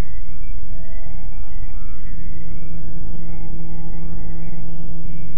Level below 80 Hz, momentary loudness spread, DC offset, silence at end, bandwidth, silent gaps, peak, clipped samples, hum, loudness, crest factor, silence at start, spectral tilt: -30 dBFS; 3 LU; 40%; 0 s; 3.2 kHz; none; -6 dBFS; under 0.1%; none; -36 LUFS; 8 dB; 0 s; -9.5 dB/octave